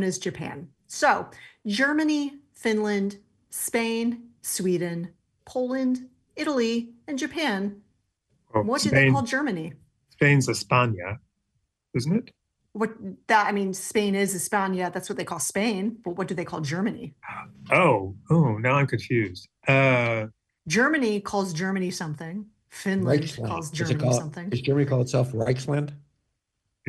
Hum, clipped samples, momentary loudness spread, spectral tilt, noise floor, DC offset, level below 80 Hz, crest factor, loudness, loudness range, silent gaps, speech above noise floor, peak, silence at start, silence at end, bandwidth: none; under 0.1%; 15 LU; -5 dB/octave; -79 dBFS; under 0.1%; -62 dBFS; 20 dB; -25 LUFS; 5 LU; none; 54 dB; -6 dBFS; 0 s; 0.9 s; 12.5 kHz